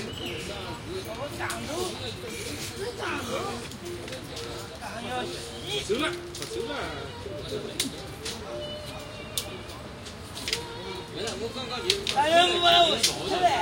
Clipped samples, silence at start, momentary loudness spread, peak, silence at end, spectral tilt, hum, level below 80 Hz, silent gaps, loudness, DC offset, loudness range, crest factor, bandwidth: under 0.1%; 0 s; 16 LU; -6 dBFS; 0 s; -3 dB/octave; none; -50 dBFS; none; -29 LUFS; under 0.1%; 10 LU; 24 dB; 17 kHz